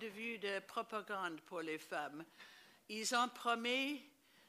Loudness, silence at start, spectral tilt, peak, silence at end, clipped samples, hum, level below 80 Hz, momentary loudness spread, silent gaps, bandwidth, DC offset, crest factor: -41 LUFS; 0 s; -2 dB/octave; -22 dBFS; 0.4 s; under 0.1%; none; under -90 dBFS; 18 LU; none; 15.5 kHz; under 0.1%; 22 dB